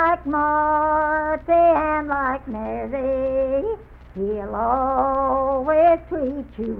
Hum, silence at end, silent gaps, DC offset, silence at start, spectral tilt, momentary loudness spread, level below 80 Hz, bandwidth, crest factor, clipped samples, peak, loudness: none; 0 s; none; under 0.1%; 0 s; -9.5 dB/octave; 11 LU; -42 dBFS; 4.3 kHz; 14 dB; under 0.1%; -6 dBFS; -21 LUFS